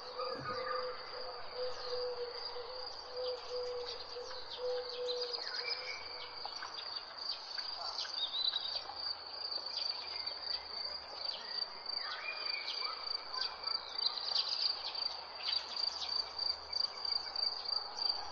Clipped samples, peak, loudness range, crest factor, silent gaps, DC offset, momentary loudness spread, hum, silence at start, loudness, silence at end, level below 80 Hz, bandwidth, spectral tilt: under 0.1%; -20 dBFS; 6 LU; 20 dB; none; under 0.1%; 9 LU; none; 0 s; -38 LUFS; 0 s; -72 dBFS; 7.8 kHz; -1 dB/octave